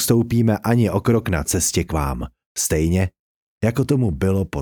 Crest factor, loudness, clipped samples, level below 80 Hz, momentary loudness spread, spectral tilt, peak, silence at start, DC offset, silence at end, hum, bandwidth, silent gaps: 16 dB; -20 LUFS; under 0.1%; -34 dBFS; 6 LU; -5.5 dB/octave; -4 dBFS; 0 s; under 0.1%; 0 s; none; over 20 kHz; 2.46-2.55 s, 3.19-3.61 s